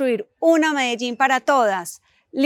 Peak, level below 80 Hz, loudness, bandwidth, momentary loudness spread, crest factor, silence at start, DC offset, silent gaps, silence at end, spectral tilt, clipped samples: -4 dBFS; -78 dBFS; -19 LUFS; 17.5 kHz; 11 LU; 16 dB; 0 s; under 0.1%; none; 0 s; -3 dB/octave; under 0.1%